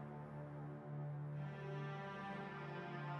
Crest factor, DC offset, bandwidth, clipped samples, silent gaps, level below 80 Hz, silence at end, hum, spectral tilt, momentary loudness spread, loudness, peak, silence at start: 12 dB; under 0.1%; 6.4 kHz; under 0.1%; none; -76 dBFS; 0 s; none; -8 dB/octave; 4 LU; -49 LUFS; -36 dBFS; 0 s